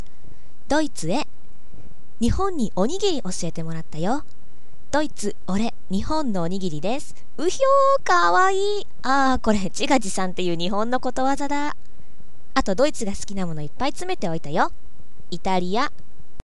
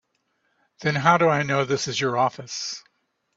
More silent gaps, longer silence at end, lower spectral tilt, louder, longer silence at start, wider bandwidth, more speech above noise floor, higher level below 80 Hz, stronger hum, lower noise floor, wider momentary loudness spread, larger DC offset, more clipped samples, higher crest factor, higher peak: neither; second, 0.05 s vs 0.55 s; about the same, -4.5 dB/octave vs -4.5 dB/octave; about the same, -23 LUFS vs -22 LUFS; about the same, 0.7 s vs 0.8 s; first, 12 kHz vs 8 kHz; second, 30 dB vs 49 dB; first, -42 dBFS vs -64 dBFS; neither; second, -53 dBFS vs -72 dBFS; about the same, 11 LU vs 12 LU; first, 10% vs under 0.1%; neither; about the same, 22 dB vs 22 dB; about the same, -2 dBFS vs -2 dBFS